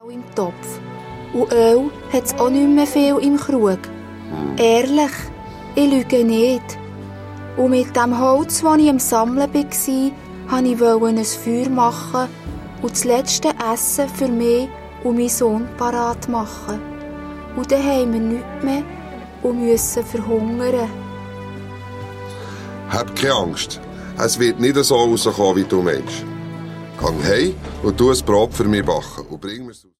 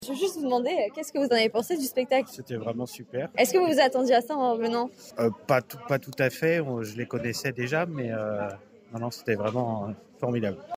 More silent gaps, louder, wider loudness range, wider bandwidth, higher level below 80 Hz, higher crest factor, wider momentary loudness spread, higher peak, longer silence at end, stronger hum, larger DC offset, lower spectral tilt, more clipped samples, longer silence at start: neither; first, -18 LUFS vs -27 LUFS; about the same, 5 LU vs 5 LU; about the same, 16 kHz vs 16 kHz; first, -42 dBFS vs -72 dBFS; about the same, 16 dB vs 20 dB; first, 17 LU vs 12 LU; first, -2 dBFS vs -6 dBFS; first, 0.25 s vs 0 s; neither; neither; about the same, -4.5 dB/octave vs -5 dB/octave; neither; about the same, 0.05 s vs 0 s